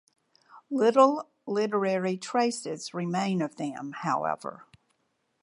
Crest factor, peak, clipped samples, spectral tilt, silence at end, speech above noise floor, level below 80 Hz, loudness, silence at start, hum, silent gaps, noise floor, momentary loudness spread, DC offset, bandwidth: 22 dB; -8 dBFS; under 0.1%; -5.5 dB/octave; 0.8 s; 48 dB; -80 dBFS; -28 LUFS; 0.55 s; none; none; -75 dBFS; 13 LU; under 0.1%; 11.5 kHz